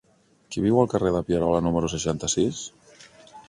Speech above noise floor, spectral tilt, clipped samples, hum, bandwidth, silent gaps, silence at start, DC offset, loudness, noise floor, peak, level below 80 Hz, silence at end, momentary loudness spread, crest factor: 25 dB; -5.5 dB/octave; under 0.1%; none; 11.5 kHz; none; 0.5 s; under 0.1%; -24 LUFS; -49 dBFS; -6 dBFS; -46 dBFS; 0.1 s; 11 LU; 20 dB